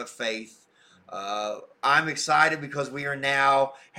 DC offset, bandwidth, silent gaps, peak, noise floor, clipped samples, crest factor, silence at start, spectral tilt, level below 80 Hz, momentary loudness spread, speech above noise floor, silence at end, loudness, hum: under 0.1%; 16 kHz; none; -8 dBFS; -57 dBFS; under 0.1%; 18 dB; 0 s; -3 dB/octave; -70 dBFS; 13 LU; 31 dB; 0 s; -24 LUFS; none